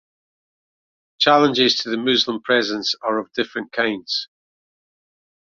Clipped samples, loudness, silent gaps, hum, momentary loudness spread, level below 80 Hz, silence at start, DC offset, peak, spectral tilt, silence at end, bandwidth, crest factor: under 0.1%; -19 LUFS; none; none; 10 LU; -66 dBFS; 1.2 s; under 0.1%; -2 dBFS; -3.5 dB/octave; 1.15 s; 7.6 kHz; 20 dB